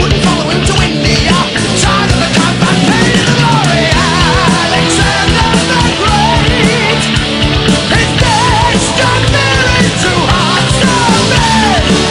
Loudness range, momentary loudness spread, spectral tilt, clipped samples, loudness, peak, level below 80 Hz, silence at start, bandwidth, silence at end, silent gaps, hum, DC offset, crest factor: 1 LU; 2 LU; -4 dB/octave; 0.1%; -9 LUFS; 0 dBFS; -22 dBFS; 0 s; 14 kHz; 0 s; none; none; under 0.1%; 10 dB